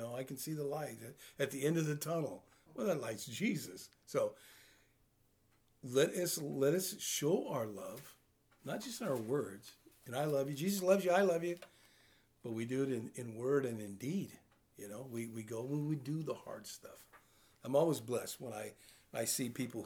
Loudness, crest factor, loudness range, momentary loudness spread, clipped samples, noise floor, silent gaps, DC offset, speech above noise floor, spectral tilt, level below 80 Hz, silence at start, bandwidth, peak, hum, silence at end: -38 LUFS; 22 dB; 5 LU; 18 LU; under 0.1%; -73 dBFS; none; under 0.1%; 35 dB; -5 dB/octave; -80 dBFS; 0 s; over 20 kHz; -18 dBFS; none; 0 s